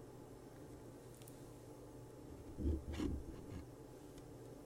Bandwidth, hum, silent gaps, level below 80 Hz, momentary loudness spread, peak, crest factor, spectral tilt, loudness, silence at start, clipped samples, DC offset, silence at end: 16 kHz; none; none; -52 dBFS; 13 LU; -28 dBFS; 20 dB; -7 dB/octave; -50 LUFS; 0 s; under 0.1%; under 0.1%; 0 s